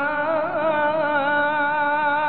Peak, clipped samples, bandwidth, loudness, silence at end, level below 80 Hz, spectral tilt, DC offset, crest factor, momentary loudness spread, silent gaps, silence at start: -10 dBFS; under 0.1%; 4.5 kHz; -21 LUFS; 0 s; -72 dBFS; -9 dB/octave; 0.6%; 12 dB; 2 LU; none; 0 s